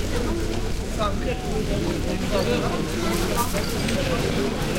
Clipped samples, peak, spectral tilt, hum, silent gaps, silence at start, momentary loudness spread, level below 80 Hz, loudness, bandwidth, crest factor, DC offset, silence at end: under 0.1%; -8 dBFS; -5 dB/octave; none; none; 0 s; 3 LU; -30 dBFS; -25 LUFS; 17 kHz; 14 dB; under 0.1%; 0 s